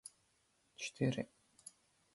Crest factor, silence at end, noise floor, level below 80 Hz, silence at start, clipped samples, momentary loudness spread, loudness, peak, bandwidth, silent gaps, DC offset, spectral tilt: 22 dB; 0.45 s; -77 dBFS; -76 dBFS; 0.05 s; under 0.1%; 20 LU; -41 LUFS; -22 dBFS; 11.5 kHz; none; under 0.1%; -5.5 dB/octave